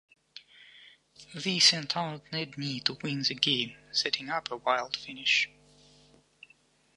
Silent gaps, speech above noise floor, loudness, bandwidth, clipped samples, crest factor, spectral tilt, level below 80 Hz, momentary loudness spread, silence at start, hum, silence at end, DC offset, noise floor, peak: none; 34 dB; -28 LUFS; 11.5 kHz; under 0.1%; 26 dB; -2 dB/octave; -72 dBFS; 14 LU; 0.35 s; none; 1.5 s; under 0.1%; -65 dBFS; -6 dBFS